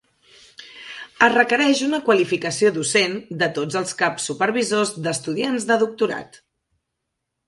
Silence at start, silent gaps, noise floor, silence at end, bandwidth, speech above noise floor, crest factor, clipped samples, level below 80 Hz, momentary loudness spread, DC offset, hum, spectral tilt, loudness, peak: 0.6 s; none; -79 dBFS; 1.2 s; 11.5 kHz; 59 dB; 20 dB; under 0.1%; -66 dBFS; 11 LU; under 0.1%; none; -3.5 dB/octave; -20 LUFS; -2 dBFS